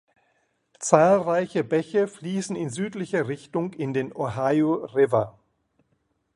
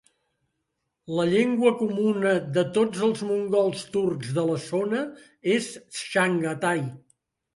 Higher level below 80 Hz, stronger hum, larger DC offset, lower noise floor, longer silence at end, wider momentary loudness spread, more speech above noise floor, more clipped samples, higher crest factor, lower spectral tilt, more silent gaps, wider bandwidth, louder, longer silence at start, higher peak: first, -64 dBFS vs -70 dBFS; neither; neither; second, -72 dBFS vs -79 dBFS; first, 1.05 s vs 0.6 s; first, 11 LU vs 8 LU; second, 48 dB vs 55 dB; neither; first, 24 dB vs 18 dB; about the same, -6 dB/octave vs -5.5 dB/octave; neither; about the same, 11.5 kHz vs 11.5 kHz; about the same, -24 LUFS vs -25 LUFS; second, 0.8 s vs 1.1 s; first, -2 dBFS vs -8 dBFS